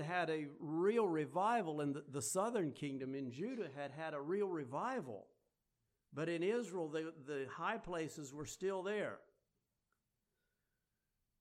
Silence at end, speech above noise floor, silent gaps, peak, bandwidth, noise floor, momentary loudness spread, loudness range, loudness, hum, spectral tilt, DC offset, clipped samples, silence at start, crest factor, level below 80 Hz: 2.2 s; 47 dB; none; -24 dBFS; 14.5 kHz; -88 dBFS; 10 LU; 6 LU; -41 LUFS; none; -5 dB/octave; under 0.1%; under 0.1%; 0 s; 18 dB; -76 dBFS